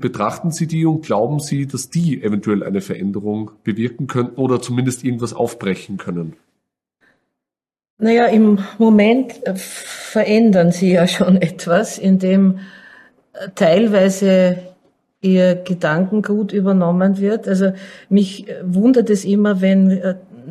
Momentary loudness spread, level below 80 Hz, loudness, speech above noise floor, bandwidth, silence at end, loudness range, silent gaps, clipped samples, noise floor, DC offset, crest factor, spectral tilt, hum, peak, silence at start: 11 LU; -60 dBFS; -16 LUFS; 72 dB; 13 kHz; 0 s; 7 LU; 7.90-7.97 s; under 0.1%; -88 dBFS; under 0.1%; 14 dB; -6.5 dB/octave; none; -2 dBFS; 0 s